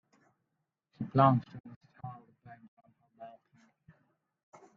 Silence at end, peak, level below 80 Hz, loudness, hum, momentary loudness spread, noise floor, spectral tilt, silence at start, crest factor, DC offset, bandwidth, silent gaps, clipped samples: 1.5 s; -10 dBFS; -74 dBFS; -29 LUFS; none; 27 LU; -85 dBFS; -7.5 dB/octave; 1 s; 26 dB; under 0.1%; 4.9 kHz; 1.60-1.64 s, 1.76-1.81 s, 2.68-2.77 s; under 0.1%